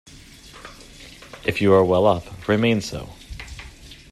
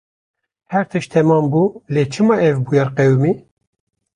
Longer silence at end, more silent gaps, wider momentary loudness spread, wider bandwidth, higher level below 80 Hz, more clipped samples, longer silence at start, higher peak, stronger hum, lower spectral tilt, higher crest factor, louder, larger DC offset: second, 0.2 s vs 0.75 s; neither; first, 25 LU vs 6 LU; first, 13.5 kHz vs 10.5 kHz; first, -46 dBFS vs -56 dBFS; neither; second, 0.55 s vs 0.7 s; about the same, -4 dBFS vs -2 dBFS; neither; second, -6 dB/octave vs -8 dB/octave; first, 20 dB vs 14 dB; second, -20 LUFS vs -16 LUFS; neither